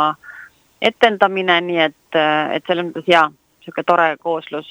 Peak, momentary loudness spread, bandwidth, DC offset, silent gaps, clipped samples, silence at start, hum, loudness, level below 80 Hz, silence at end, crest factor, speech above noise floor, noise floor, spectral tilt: 0 dBFS; 10 LU; over 20 kHz; under 0.1%; none; 0.1%; 0 s; none; -17 LUFS; -64 dBFS; 0.1 s; 18 dB; 25 dB; -42 dBFS; -5 dB/octave